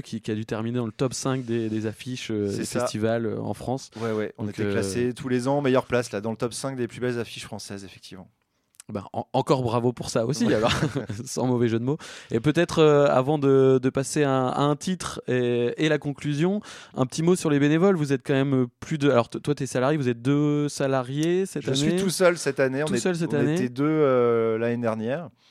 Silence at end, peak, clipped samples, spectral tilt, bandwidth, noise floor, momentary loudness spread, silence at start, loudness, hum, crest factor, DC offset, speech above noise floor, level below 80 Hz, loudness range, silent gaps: 0.2 s; -4 dBFS; under 0.1%; -6 dB/octave; 15 kHz; -55 dBFS; 10 LU; 0.05 s; -24 LUFS; none; 20 dB; under 0.1%; 31 dB; -58 dBFS; 7 LU; none